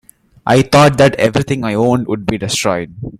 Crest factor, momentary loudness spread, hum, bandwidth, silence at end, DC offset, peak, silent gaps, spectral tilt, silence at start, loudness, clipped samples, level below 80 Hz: 14 dB; 10 LU; none; 15.5 kHz; 0.05 s; under 0.1%; 0 dBFS; none; -5.5 dB/octave; 0.45 s; -13 LUFS; under 0.1%; -40 dBFS